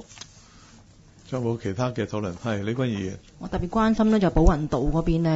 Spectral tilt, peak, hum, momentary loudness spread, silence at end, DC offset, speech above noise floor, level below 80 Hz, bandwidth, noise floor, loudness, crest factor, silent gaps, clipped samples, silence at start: -7.5 dB/octave; -4 dBFS; none; 14 LU; 0 s; under 0.1%; 28 dB; -32 dBFS; 8 kHz; -51 dBFS; -25 LUFS; 20 dB; none; under 0.1%; 0 s